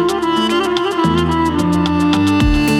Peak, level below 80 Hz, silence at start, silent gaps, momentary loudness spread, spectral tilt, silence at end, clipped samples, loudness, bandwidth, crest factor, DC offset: 0 dBFS; -26 dBFS; 0 s; none; 2 LU; -6 dB/octave; 0 s; under 0.1%; -15 LUFS; 17.5 kHz; 14 dB; under 0.1%